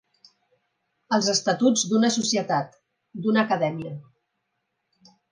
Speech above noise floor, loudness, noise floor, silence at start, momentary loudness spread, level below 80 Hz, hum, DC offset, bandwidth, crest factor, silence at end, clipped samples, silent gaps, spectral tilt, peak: 55 dB; -23 LUFS; -78 dBFS; 1.1 s; 16 LU; -74 dBFS; none; under 0.1%; 10.5 kHz; 20 dB; 1.3 s; under 0.1%; none; -3.5 dB/octave; -6 dBFS